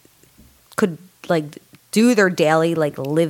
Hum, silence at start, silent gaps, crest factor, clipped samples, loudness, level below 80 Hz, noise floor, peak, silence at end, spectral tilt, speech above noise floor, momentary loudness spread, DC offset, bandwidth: none; 0.8 s; none; 18 dB; under 0.1%; -18 LUFS; -64 dBFS; -51 dBFS; -2 dBFS; 0 s; -5.5 dB/octave; 34 dB; 13 LU; under 0.1%; 17 kHz